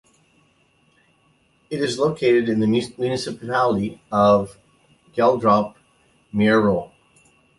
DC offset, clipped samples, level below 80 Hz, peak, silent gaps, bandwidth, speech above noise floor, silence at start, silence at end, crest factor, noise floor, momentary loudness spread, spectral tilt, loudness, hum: under 0.1%; under 0.1%; -54 dBFS; -4 dBFS; none; 11.5 kHz; 42 dB; 1.7 s; 0.7 s; 18 dB; -61 dBFS; 13 LU; -6 dB/octave; -20 LUFS; none